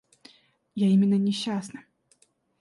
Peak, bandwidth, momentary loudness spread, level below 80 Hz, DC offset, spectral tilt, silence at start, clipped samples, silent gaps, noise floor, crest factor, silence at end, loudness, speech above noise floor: -14 dBFS; 11.5 kHz; 20 LU; -72 dBFS; under 0.1%; -7 dB/octave; 0.75 s; under 0.1%; none; -65 dBFS; 14 dB; 0.8 s; -24 LUFS; 42 dB